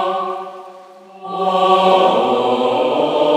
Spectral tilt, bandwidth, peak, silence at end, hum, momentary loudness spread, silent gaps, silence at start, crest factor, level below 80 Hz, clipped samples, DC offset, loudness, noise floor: -5.5 dB/octave; 14.5 kHz; 0 dBFS; 0 s; none; 18 LU; none; 0 s; 16 dB; -78 dBFS; under 0.1%; under 0.1%; -15 LUFS; -39 dBFS